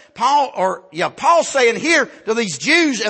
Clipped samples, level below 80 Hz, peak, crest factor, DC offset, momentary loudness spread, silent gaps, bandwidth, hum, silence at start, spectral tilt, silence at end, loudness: under 0.1%; -66 dBFS; -2 dBFS; 14 dB; under 0.1%; 8 LU; none; 8.8 kHz; none; 0.15 s; -2.5 dB/octave; 0 s; -16 LUFS